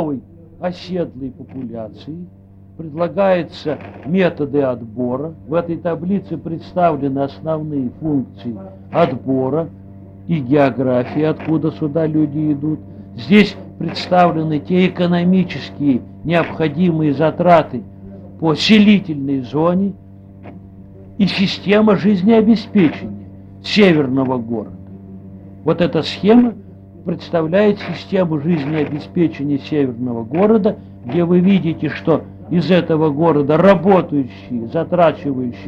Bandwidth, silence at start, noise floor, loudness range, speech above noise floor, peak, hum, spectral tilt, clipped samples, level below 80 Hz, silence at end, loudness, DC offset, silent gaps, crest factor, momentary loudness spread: 7.8 kHz; 0 s; -37 dBFS; 5 LU; 22 dB; 0 dBFS; none; -8 dB/octave; under 0.1%; -50 dBFS; 0 s; -16 LUFS; under 0.1%; none; 16 dB; 17 LU